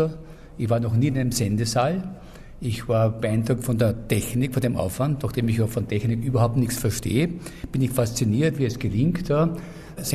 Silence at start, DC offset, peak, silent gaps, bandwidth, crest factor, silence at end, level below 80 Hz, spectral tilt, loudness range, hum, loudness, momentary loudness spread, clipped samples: 0 s; under 0.1%; -8 dBFS; none; 14.5 kHz; 14 dB; 0 s; -42 dBFS; -6 dB/octave; 1 LU; none; -24 LUFS; 9 LU; under 0.1%